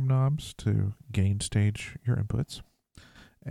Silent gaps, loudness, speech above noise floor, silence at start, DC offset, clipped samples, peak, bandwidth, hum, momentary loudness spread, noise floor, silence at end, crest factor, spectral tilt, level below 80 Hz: none; -29 LUFS; 28 dB; 0 s; under 0.1%; under 0.1%; -12 dBFS; 12.5 kHz; none; 9 LU; -55 dBFS; 0 s; 16 dB; -6 dB/octave; -50 dBFS